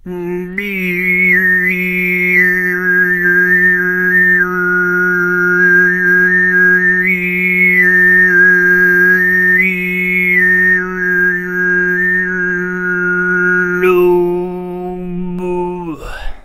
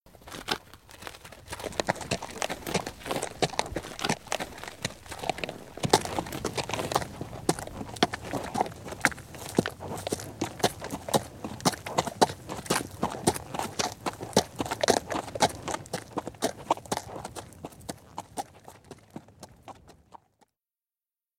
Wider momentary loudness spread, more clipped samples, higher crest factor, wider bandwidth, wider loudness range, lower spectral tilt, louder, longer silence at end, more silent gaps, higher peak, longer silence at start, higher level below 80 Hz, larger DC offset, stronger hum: second, 12 LU vs 16 LU; neither; second, 12 dB vs 30 dB; about the same, 15.5 kHz vs 17 kHz; second, 5 LU vs 8 LU; first, -7 dB/octave vs -3.5 dB/octave; first, -10 LUFS vs -31 LUFS; second, 0.05 s vs 1.25 s; neither; about the same, 0 dBFS vs -2 dBFS; about the same, 0.05 s vs 0.05 s; first, -40 dBFS vs -54 dBFS; neither; neither